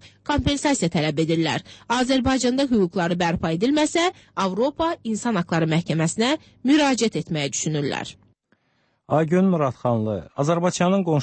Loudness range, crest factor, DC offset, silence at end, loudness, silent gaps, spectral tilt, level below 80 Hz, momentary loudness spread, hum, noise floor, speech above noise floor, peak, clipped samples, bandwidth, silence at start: 2 LU; 14 dB; under 0.1%; 0 s; -22 LUFS; none; -5 dB/octave; -46 dBFS; 6 LU; none; -67 dBFS; 46 dB; -8 dBFS; under 0.1%; 8.8 kHz; 0.05 s